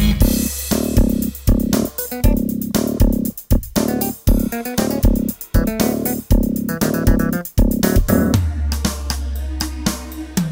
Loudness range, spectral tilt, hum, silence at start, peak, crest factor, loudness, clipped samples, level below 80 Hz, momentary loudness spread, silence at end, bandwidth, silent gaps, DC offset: 1 LU; -5.5 dB/octave; none; 0 s; -2 dBFS; 16 dB; -19 LUFS; under 0.1%; -22 dBFS; 7 LU; 0 s; 16.5 kHz; none; under 0.1%